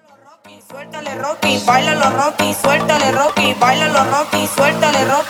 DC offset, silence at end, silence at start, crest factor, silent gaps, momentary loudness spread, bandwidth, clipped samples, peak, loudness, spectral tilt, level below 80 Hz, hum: under 0.1%; 0 s; 0.45 s; 16 dB; none; 11 LU; over 20 kHz; under 0.1%; 0 dBFS; -14 LUFS; -3.5 dB/octave; -54 dBFS; none